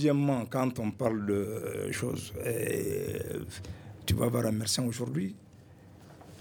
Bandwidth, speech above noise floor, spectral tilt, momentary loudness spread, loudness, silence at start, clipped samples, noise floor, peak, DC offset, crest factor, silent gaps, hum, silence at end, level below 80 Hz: over 20 kHz; 23 dB; -5.5 dB/octave; 12 LU; -32 LUFS; 0 s; under 0.1%; -54 dBFS; -12 dBFS; under 0.1%; 18 dB; none; none; 0 s; -56 dBFS